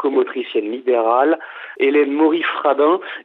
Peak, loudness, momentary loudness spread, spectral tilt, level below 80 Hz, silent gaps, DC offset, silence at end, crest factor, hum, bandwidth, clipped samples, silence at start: -2 dBFS; -17 LUFS; 7 LU; -7 dB/octave; -88 dBFS; none; under 0.1%; 0.05 s; 14 dB; none; 4.2 kHz; under 0.1%; 0 s